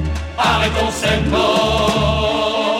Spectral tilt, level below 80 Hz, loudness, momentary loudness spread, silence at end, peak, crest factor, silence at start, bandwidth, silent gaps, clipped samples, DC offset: -4.5 dB/octave; -26 dBFS; -16 LUFS; 3 LU; 0 s; -4 dBFS; 14 dB; 0 s; 16.5 kHz; none; under 0.1%; under 0.1%